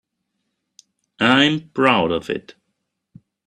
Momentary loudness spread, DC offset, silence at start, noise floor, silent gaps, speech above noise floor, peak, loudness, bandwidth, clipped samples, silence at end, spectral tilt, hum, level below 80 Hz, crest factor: 12 LU; under 0.1%; 1.2 s; -75 dBFS; none; 57 dB; 0 dBFS; -18 LUFS; 10.5 kHz; under 0.1%; 1.05 s; -5 dB/octave; none; -60 dBFS; 22 dB